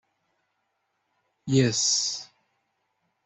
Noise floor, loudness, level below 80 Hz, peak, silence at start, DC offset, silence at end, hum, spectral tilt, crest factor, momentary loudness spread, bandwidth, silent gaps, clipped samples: -76 dBFS; -23 LUFS; -62 dBFS; -8 dBFS; 1.45 s; under 0.1%; 1 s; none; -3.5 dB/octave; 22 dB; 15 LU; 8.4 kHz; none; under 0.1%